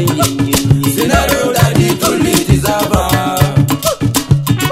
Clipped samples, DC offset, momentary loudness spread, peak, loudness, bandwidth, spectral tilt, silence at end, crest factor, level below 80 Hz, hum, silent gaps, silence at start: 0.5%; under 0.1%; 2 LU; 0 dBFS; -12 LUFS; 16.5 kHz; -5 dB/octave; 0 s; 12 dB; -26 dBFS; none; none; 0 s